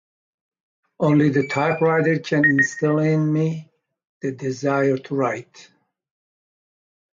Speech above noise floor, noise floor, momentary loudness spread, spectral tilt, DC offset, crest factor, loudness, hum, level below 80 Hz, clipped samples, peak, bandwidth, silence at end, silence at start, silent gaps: over 70 dB; under -90 dBFS; 10 LU; -7 dB/octave; under 0.1%; 16 dB; -20 LUFS; none; -66 dBFS; under 0.1%; -6 dBFS; 7.6 kHz; 1.5 s; 1 s; 4.09-4.21 s